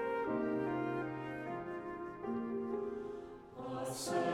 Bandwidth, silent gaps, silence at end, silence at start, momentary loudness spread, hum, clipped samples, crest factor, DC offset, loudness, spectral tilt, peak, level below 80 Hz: 16 kHz; none; 0 s; 0 s; 9 LU; none; under 0.1%; 16 dB; under 0.1%; -40 LUFS; -5.5 dB/octave; -24 dBFS; -68 dBFS